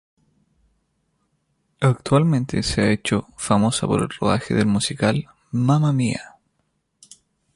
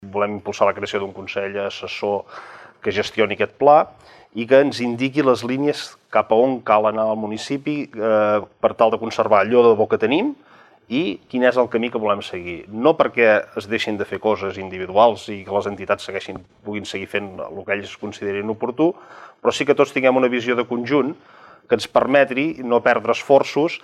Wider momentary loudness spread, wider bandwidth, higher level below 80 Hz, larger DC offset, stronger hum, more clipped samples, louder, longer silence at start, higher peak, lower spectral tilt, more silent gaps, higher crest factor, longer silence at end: second, 6 LU vs 12 LU; about the same, 11.5 kHz vs 12 kHz; first, -46 dBFS vs -62 dBFS; neither; neither; neither; about the same, -21 LUFS vs -19 LUFS; first, 1.8 s vs 0 s; about the same, -4 dBFS vs -2 dBFS; about the same, -5.5 dB/octave vs -5.5 dB/octave; neither; about the same, 18 dB vs 18 dB; first, 1.3 s vs 0.05 s